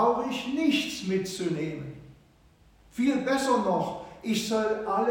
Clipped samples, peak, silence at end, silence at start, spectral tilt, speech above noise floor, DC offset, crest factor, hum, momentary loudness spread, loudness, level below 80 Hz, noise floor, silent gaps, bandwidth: under 0.1%; -12 dBFS; 0 s; 0 s; -4.5 dB/octave; 31 dB; under 0.1%; 16 dB; none; 12 LU; -28 LUFS; -60 dBFS; -59 dBFS; none; 17 kHz